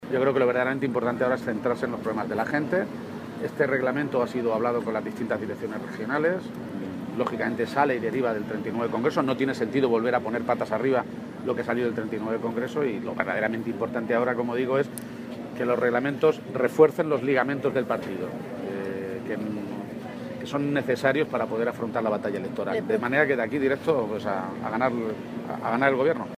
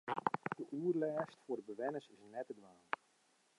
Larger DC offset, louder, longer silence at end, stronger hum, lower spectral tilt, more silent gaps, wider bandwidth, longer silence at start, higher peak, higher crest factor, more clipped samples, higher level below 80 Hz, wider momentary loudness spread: neither; first, -26 LUFS vs -43 LUFS; second, 0 s vs 0.85 s; neither; about the same, -7 dB/octave vs -7 dB/octave; neither; first, 15.5 kHz vs 11 kHz; about the same, 0 s vs 0.05 s; first, -6 dBFS vs -18 dBFS; about the same, 20 dB vs 24 dB; neither; first, -66 dBFS vs under -90 dBFS; about the same, 10 LU vs 12 LU